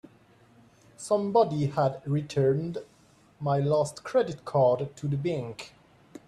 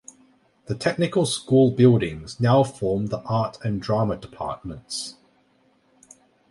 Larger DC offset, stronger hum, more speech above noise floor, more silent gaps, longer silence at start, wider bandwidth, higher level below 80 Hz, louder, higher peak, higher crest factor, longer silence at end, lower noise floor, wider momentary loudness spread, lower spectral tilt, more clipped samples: neither; neither; second, 32 dB vs 41 dB; neither; first, 1 s vs 0.7 s; about the same, 12 kHz vs 11.5 kHz; second, -64 dBFS vs -52 dBFS; second, -27 LUFS vs -23 LUFS; second, -12 dBFS vs -4 dBFS; about the same, 16 dB vs 20 dB; second, 0.6 s vs 1.4 s; about the same, -59 dBFS vs -62 dBFS; about the same, 14 LU vs 14 LU; about the same, -7 dB/octave vs -6.5 dB/octave; neither